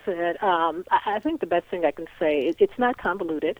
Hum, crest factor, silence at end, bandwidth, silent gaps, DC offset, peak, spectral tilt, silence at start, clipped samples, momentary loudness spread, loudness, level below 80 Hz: none; 16 dB; 0.05 s; over 20 kHz; none; under 0.1%; -8 dBFS; -6.5 dB/octave; 0.05 s; under 0.1%; 5 LU; -24 LUFS; -58 dBFS